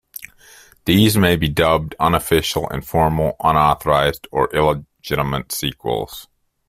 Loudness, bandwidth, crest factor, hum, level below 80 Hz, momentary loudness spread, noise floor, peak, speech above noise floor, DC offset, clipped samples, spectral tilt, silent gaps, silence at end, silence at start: -18 LUFS; 16 kHz; 16 dB; none; -38 dBFS; 10 LU; -47 dBFS; -2 dBFS; 30 dB; under 0.1%; under 0.1%; -5 dB/octave; none; 0.45 s; 0.15 s